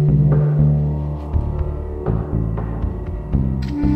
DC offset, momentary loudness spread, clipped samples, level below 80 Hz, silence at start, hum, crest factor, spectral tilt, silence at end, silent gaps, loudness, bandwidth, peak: under 0.1%; 10 LU; under 0.1%; -24 dBFS; 0 s; none; 14 dB; -11 dB/octave; 0 s; none; -20 LUFS; 5 kHz; -4 dBFS